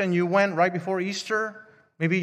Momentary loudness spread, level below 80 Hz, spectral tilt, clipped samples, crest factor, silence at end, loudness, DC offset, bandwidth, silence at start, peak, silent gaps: 7 LU; -76 dBFS; -6 dB/octave; under 0.1%; 18 dB; 0 s; -25 LUFS; under 0.1%; 10.5 kHz; 0 s; -8 dBFS; none